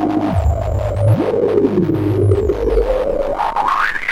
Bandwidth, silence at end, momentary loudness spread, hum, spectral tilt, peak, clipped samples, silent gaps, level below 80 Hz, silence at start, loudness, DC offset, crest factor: 12 kHz; 0 s; 4 LU; none; -8 dB/octave; -2 dBFS; under 0.1%; none; -26 dBFS; 0 s; -16 LUFS; under 0.1%; 14 dB